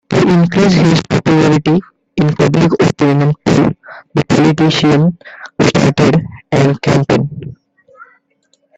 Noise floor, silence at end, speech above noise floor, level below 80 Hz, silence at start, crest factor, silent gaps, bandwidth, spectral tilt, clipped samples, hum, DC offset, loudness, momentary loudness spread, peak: -59 dBFS; 0.75 s; 48 dB; -42 dBFS; 0.1 s; 12 dB; none; 8.2 kHz; -6.5 dB/octave; under 0.1%; none; under 0.1%; -12 LUFS; 9 LU; 0 dBFS